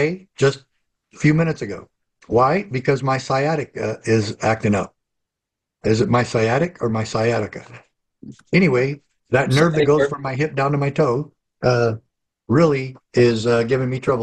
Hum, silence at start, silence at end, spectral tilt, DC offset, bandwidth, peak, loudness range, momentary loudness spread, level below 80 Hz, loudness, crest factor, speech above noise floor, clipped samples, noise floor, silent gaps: none; 0 s; 0 s; -6.5 dB/octave; under 0.1%; 12 kHz; -4 dBFS; 3 LU; 9 LU; -50 dBFS; -19 LUFS; 16 dB; 65 dB; under 0.1%; -83 dBFS; none